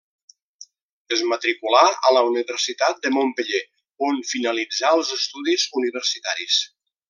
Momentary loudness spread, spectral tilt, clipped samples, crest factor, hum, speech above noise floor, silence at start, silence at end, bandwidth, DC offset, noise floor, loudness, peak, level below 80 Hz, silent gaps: 9 LU; 0 dB/octave; under 0.1%; 20 dB; none; 28 dB; 0.6 s; 0.45 s; 11 kHz; under 0.1%; -48 dBFS; -21 LUFS; -2 dBFS; -82 dBFS; 0.82-1.05 s